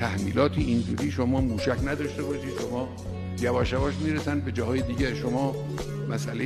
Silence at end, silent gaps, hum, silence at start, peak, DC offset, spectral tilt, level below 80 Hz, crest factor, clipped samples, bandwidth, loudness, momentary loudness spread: 0 s; none; none; 0 s; -10 dBFS; under 0.1%; -6.5 dB/octave; -40 dBFS; 16 dB; under 0.1%; 13.5 kHz; -28 LUFS; 8 LU